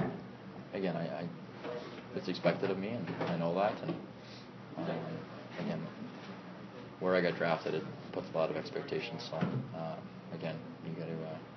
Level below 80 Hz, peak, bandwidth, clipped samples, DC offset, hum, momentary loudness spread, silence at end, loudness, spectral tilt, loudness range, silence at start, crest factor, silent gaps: -74 dBFS; -16 dBFS; 6.4 kHz; under 0.1%; under 0.1%; none; 15 LU; 0 s; -38 LUFS; -5 dB/octave; 4 LU; 0 s; 22 dB; none